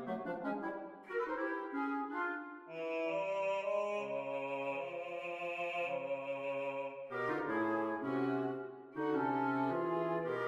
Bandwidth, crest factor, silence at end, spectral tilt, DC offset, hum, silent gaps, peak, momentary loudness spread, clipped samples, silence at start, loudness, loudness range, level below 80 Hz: 9.4 kHz; 14 dB; 0 s; -7 dB/octave; under 0.1%; none; none; -24 dBFS; 7 LU; under 0.1%; 0 s; -38 LUFS; 3 LU; -82 dBFS